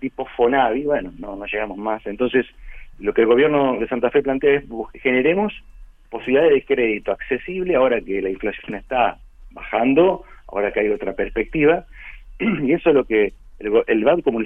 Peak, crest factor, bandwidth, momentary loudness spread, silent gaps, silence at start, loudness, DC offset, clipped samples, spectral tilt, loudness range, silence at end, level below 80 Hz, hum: -2 dBFS; 16 dB; 3.8 kHz; 14 LU; none; 0 s; -19 LUFS; under 0.1%; under 0.1%; -8.5 dB/octave; 2 LU; 0 s; -42 dBFS; none